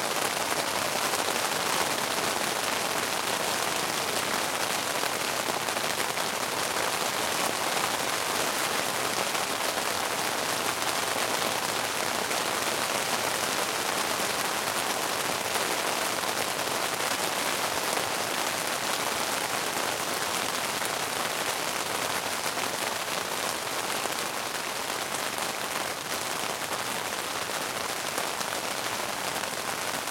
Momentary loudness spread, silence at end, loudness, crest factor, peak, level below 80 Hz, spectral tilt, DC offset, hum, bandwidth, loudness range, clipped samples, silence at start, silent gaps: 3 LU; 0 s; -28 LUFS; 22 dB; -6 dBFS; -66 dBFS; -1 dB/octave; under 0.1%; none; 17 kHz; 3 LU; under 0.1%; 0 s; none